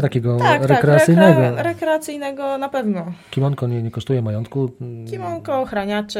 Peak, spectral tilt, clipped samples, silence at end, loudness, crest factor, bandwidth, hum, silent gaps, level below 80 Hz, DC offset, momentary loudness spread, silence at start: 0 dBFS; -7 dB/octave; under 0.1%; 0 s; -18 LUFS; 18 dB; 15.5 kHz; none; none; -54 dBFS; under 0.1%; 15 LU; 0 s